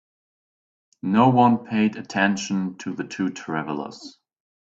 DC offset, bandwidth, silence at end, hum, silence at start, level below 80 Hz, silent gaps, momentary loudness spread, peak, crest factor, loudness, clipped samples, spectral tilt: under 0.1%; 7.8 kHz; 0.5 s; none; 1.05 s; -66 dBFS; none; 14 LU; -4 dBFS; 20 dB; -22 LUFS; under 0.1%; -6 dB/octave